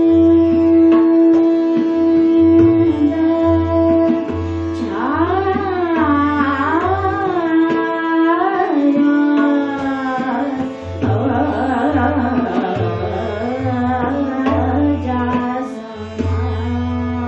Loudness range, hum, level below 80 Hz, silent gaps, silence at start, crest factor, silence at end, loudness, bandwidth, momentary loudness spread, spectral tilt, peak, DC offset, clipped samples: 6 LU; none; -46 dBFS; none; 0 s; 12 dB; 0 s; -16 LUFS; 6.2 kHz; 10 LU; -8.5 dB/octave; -2 dBFS; under 0.1%; under 0.1%